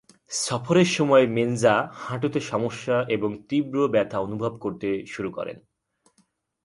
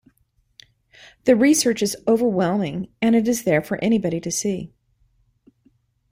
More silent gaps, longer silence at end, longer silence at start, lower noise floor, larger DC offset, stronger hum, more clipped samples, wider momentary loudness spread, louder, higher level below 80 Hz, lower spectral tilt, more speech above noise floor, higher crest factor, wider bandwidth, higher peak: neither; second, 1.05 s vs 1.45 s; second, 0.3 s vs 1.25 s; about the same, -67 dBFS vs -65 dBFS; neither; neither; neither; first, 12 LU vs 9 LU; second, -24 LUFS vs -20 LUFS; about the same, -62 dBFS vs -58 dBFS; about the same, -5 dB/octave vs -4.5 dB/octave; about the same, 44 dB vs 45 dB; about the same, 20 dB vs 18 dB; second, 11.5 kHz vs 16 kHz; about the same, -6 dBFS vs -4 dBFS